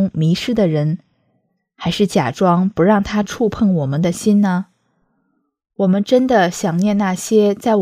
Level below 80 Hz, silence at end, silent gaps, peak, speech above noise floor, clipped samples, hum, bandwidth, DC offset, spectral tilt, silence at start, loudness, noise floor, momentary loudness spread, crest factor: -48 dBFS; 0 s; none; 0 dBFS; 51 dB; under 0.1%; none; 15 kHz; under 0.1%; -6.5 dB/octave; 0 s; -16 LUFS; -67 dBFS; 6 LU; 16 dB